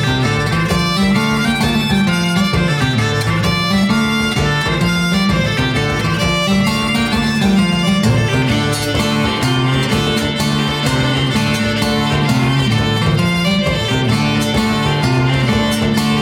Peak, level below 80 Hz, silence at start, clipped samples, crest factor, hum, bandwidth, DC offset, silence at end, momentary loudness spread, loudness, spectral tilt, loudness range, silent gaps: -2 dBFS; -32 dBFS; 0 s; under 0.1%; 12 dB; none; 17 kHz; under 0.1%; 0 s; 2 LU; -15 LUFS; -5 dB/octave; 1 LU; none